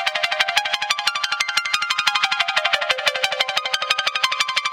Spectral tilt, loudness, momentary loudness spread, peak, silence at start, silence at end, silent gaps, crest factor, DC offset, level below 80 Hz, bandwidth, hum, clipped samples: 2 dB/octave; -19 LUFS; 2 LU; 0 dBFS; 0 s; 0 s; none; 22 dB; under 0.1%; -66 dBFS; 17 kHz; none; under 0.1%